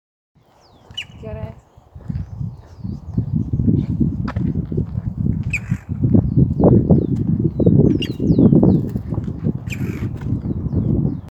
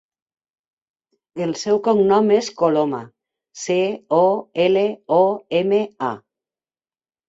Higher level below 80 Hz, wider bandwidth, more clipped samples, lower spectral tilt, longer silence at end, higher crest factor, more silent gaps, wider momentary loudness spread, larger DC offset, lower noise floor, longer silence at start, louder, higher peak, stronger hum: first, -32 dBFS vs -64 dBFS; about the same, 8.2 kHz vs 8 kHz; neither; first, -9 dB/octave vs -5.5 dB/octave; second, 0 s vs 1.1 s; about the same, 18 dB vs 18 dB; neither; first, 17 LU vs 11 LU; neither; second, -50 dBFS vs under -90 dBFS; second, 0.9 s vs 1.35 s; about the same, -18 LUFS vs -19 LUFS; first, 0 dBFS vs -4 dBFS; neither